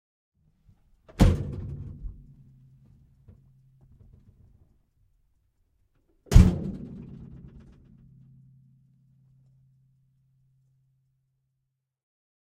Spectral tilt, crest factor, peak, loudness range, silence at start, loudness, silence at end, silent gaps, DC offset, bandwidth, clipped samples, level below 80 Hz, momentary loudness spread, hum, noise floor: -7.5 dB/octave; 30 dB; -2 dBFS; 20 LU; 1.2 s; -24 LUFS; 5.2 s; none; under 0.1%; 14 kHz; under 0.1%; -34 dBFS; 28 LU; none; -81 dBFS